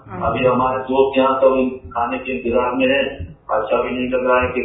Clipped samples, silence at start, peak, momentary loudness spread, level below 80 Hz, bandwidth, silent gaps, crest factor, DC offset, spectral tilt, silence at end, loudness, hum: under 0.1%; 0.05 s; -2 dBFS; 8 LU; -42 dBFS; 3.9 kHz; none; 16 dB; under 0.1%; -9.5 dB/octave; 0 s; -18 LUFS; none